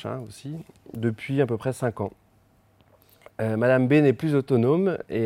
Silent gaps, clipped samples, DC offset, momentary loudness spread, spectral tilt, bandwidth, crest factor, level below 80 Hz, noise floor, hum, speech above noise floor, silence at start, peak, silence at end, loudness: none; under 0.1%; under 0.1%; 18 LU; -8 dB/octave; 16 kHz; 16 dB; -64 dBFS; -61 dBFS; none; 37 dB; 0 s; -8 dBFS; 0 s; -24 LUFS